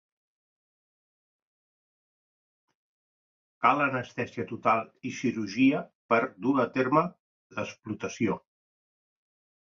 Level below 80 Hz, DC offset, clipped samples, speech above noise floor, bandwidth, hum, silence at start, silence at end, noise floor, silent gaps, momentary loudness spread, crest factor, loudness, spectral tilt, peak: -70 dBFS; under 0.1%; under 0.1%; over 62 dB; 7.4 kHz; none; 3.6 s; 1.35 s; under -90 dBFS; 5.95-6.09 s, 7.20-7.50 s; 12 LU; 24 dB; -28 LUFS; -6 dB/octave; -8 dBFS